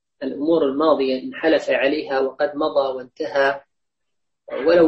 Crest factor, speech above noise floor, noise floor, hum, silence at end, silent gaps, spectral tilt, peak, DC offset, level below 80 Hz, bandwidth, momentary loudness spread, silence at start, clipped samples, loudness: 16 dB; 62 dB; -81 dBFS; none; 0 s; none; -5.5 dB/octave; -4 dBFS; under 0.1%; -60 dBFS; 8 kHz; 9 LU; 0.2 s; under 0.1%; -20 LUFS